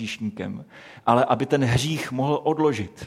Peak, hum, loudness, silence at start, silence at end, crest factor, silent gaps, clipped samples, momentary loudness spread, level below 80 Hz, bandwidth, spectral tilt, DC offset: -2 dBFS; none; -23 LUFS; 0 s; 0 s; 20 dB; none; under 0.1%; 12 LU; -50 dBFS; 15.5 kHz; -6 dB/octave; under 0.1%